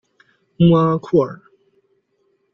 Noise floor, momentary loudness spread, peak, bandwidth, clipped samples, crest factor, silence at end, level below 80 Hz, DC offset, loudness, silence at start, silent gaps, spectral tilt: -65 dBFS; 6 LU; -2 dBFS; 5.8 kHz; under 0.1%; 18 dB; 1.2 s; -52 dBFS; under 0.1%; -16 LUFS; 0.6 s; none; -10 dB/octave